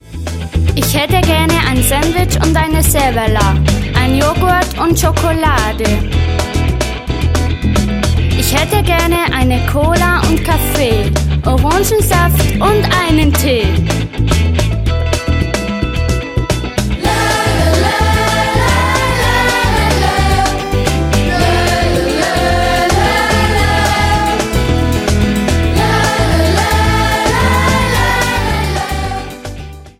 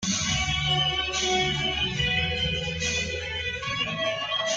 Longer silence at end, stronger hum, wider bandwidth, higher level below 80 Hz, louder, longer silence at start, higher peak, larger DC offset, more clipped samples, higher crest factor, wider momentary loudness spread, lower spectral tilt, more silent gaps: about the same, 0.1 s vs 0 s; neither; first, 16.5 kHz vs 10 kHz; first, -18 dBFS vs -42 dBFS; first, -12 LUFS vs -25 LUFS; about the same, 0.05 s vs 0 s; first, 0 dBFS vs -12 dBFS; neither; neither; about the same, 12 dB vs 14 dB; about the same, 5 LU vs 5 LU; first, -5 dB/octave vs -2.5 dB/octave; neither